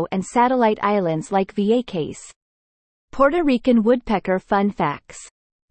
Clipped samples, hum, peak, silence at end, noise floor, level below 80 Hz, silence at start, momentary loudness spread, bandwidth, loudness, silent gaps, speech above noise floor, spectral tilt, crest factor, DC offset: under 0.1%; none; -4 dBFS; 0.45 s; under -90 dBFS; -48 dBFS; 0 s; 15 LU; 8.8 kHz; -20 LUFS; 2.36-3.08 s; over 70 dB; -6.5 dB/octave; 18 dB; under 0.1%